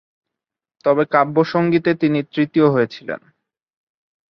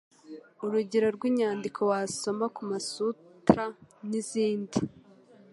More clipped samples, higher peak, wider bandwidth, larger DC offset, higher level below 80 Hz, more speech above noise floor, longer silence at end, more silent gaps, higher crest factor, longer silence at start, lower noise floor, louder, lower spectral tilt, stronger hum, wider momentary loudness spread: neither; about the same, -2 dBFS vs -4 dBFS; second, 6.2 kHz vs 11.5 kHz; neither; about the same, -62 dBFS vs -64 dBFS; first, 69 dB vs 27 dB; first, 1.15 s vs 0.5 s; neither; second, 18 dB vs 26 dB; first, 0.85 s vs 0.25 s; first, -85 dBFS vs -56 dBFS; first, -17 LUFS vs -30 LUFS; first, -8.5 dB/octave vs -5.5 dB/octave; neither; about the same, 10 LU vs 12 LU